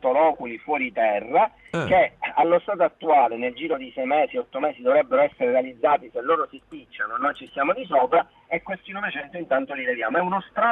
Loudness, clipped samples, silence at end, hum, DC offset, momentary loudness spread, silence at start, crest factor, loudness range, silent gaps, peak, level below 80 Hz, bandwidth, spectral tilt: -23 LUFS; under 0.1%; 0 s; none; under 0.1%; 9 LU; 0.05 s; 14 dB; 3 LU; none; -8 dBFS; -60 dBFS; 7.6 kHz; -6.5 dB/octave